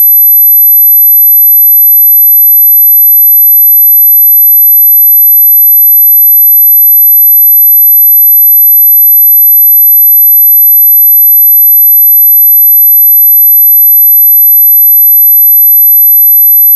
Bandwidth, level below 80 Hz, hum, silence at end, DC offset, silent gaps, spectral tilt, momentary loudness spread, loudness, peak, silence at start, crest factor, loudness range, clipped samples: 13 kHz; under -90 dBFS; none; 0 s; under 0.1%; none; 4 dB/octave; 0 LU; 1 LUFS; 0 dBFS; 0 s; 2 dB; 0 LU; under 0.1%